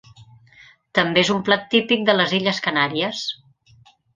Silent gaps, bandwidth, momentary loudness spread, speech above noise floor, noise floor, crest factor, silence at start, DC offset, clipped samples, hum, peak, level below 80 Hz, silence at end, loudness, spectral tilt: none; 9.6 kHz; 8 LU; 34 dB; -54 dBFS; 22 dB; 0.2 s; under 0.1%; under 0.1%; none; 0 dBFS; -62 dBFS; 0.8 s; -19 LUFS; -4.5 dB/octave